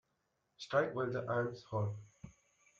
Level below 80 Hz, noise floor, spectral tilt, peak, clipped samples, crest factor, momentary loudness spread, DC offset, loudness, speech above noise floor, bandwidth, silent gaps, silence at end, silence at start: -74 dBFS; -82 dBFS; -7 dB/octave; -20 dBFS; under 0.1%; 20 dB; 22 LU; under 0.1%; -38 LUFS; 45 dB; 7.6 kHz; none; 0.5 s; 0.6 s